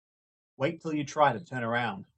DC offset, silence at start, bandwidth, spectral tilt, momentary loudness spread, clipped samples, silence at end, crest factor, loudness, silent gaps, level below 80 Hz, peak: under 0.1%; 0.6 s; 8.6 kHz; -5.5 dB/octave; 8 LU; under 0.1%; 0.15 s; 22 dB; -30 LUFS; none; -72 dBFS; -10 dBFS